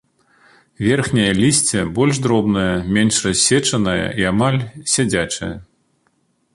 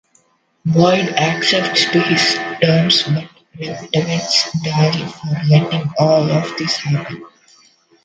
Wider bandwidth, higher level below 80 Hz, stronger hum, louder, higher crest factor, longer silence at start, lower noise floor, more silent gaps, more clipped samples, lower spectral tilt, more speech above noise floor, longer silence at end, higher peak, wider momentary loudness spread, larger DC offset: first, 11.5 kHz vs 9 kHz; first, -42 dBFS vs -56 dBFS; neither; about the same, -17 LUFS vs -15 LUFS; about the same, 16 dB vs 16 dB; first, 0.8 s vs 0.65 s; first, -63 dBFS vs -58 dBFS; neither; neither; about the same, -4 dB/octave vs -5 dB/octave; first, 47 dB vs 42 dB; first, 0.9 s vs 0.75 s; about the same, -2 dBFS vs 0 dBFS; about the same, 8 LU vs 10 LU; neither